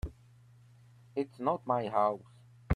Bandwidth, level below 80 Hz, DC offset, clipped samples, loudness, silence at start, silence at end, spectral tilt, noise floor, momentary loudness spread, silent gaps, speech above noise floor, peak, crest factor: 11 kHz; -52 dBFS; under 0.1%; under 0.1%; -33 LUFS; 0.05 s; 0 s; -8.5 dB/octave; -59 dBFS; 13 LU; none; 27 dB; -16 dBFS; 20 dB